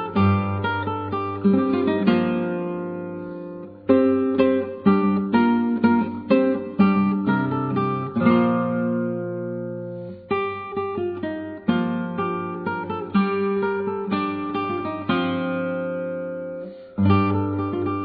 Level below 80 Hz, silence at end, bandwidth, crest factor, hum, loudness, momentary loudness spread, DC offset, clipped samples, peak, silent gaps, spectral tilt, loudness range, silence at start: -60 dBFS; 0 s; 5 kHz; 18 dB; none; -23 LUFS; 11 LU; under 0.1%; under 0.1%; -4 dBFS; none; -10.5 dB/octave; 6 LU; 0 s